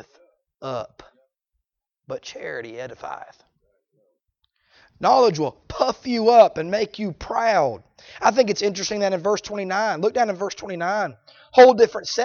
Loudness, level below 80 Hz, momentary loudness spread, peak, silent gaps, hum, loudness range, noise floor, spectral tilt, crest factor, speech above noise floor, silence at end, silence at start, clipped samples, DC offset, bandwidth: -20 LUFS; -56 dBFS; 20 LU; -2 dBFS; none; none; 17 LU; -81 dBFS; -4 dB/octave; 20 dB; 61 dB; 0 s; 0.6 s; under 0.1%; under 0.1%; 7.2 kHz